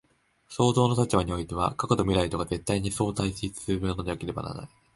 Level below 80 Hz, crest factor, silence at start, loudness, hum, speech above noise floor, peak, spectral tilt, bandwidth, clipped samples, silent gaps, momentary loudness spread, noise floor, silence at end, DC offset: -44 dBFS; 22 dB; 0.5 s; -27 LUFS; none; 32 dB; -6 dBFS; -6 dB/octave; 11.5 kHz; under 0.1%; none; 11 LU; -59 dBFS; 0.3 s; under 0.1%